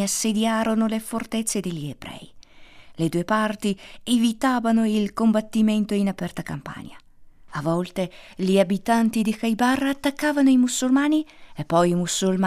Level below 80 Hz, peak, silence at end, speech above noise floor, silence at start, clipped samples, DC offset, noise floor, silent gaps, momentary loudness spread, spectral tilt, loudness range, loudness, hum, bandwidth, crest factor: -54 dBFS; -6 dBFS; 0 s; 25 dB; 0 s; under 0.1%; under 0.1%; -47 dBFS; none; 13 LU; -5 dB/octave; 5 LU; -22 LUFS; none; 15.5 kHz; 16 dB